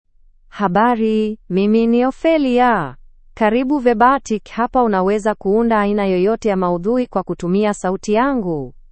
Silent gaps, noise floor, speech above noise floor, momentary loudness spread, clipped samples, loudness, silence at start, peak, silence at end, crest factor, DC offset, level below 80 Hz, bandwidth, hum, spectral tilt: none; -47 dBFS; 31 dB; 7 LU; under 0.1%; -17 LUFS; 0.55 s; 0 dBFS; 0.2 s; 16 dB; under 0.1%; -42 dBFS; 8.8 kHz; none; -6.5 dB/octave